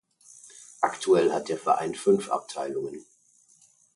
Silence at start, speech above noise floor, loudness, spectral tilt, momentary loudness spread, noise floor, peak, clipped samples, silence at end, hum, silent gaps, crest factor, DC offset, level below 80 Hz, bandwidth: 0.45 s; 36 dB; -26 LUFS; -4.5 dB/octave; 23 LU; -62 dBFS; -8 dBFS; under 0.1%; 0.95 s; none; none; 20 dB; under 0.1%; -72 dBFS; 11.5 kHz